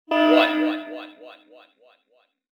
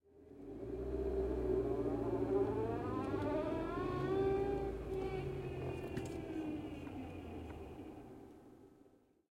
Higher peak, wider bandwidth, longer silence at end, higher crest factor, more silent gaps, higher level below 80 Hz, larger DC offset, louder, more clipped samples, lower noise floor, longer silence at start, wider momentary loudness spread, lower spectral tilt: first, -4 dBFS vs -24 dBFS; second, 6.8 kHz vs 12 kHz; first, 1.25 s vs 0.45 s; about the same, 20 dB vs 16 dB; neither; second, -82 dBFS vs -52 dBFS; neither; first, -20 LUFS vs -40 LUFS; neither; about the same, -65 dBFS vs -68 dBFS; about the same, 0.1 s vs 0.15 s; first, 21 LU vs 16 LU; second, -3.5 dB/octave vs -8 dB/octave